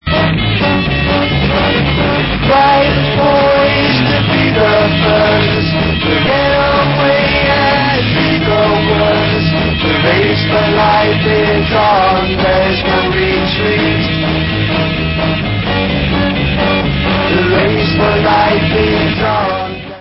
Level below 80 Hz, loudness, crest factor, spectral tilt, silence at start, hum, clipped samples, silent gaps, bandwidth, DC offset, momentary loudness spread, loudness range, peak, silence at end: -26 dBFS; -11 LUFS; 12 dB; -10 dB/octave; 0.05 s; none; under 0.1%; none; 5.8 kHz; under 0.1%; 4 LU; 3 LU; 0 dBFS; 0 s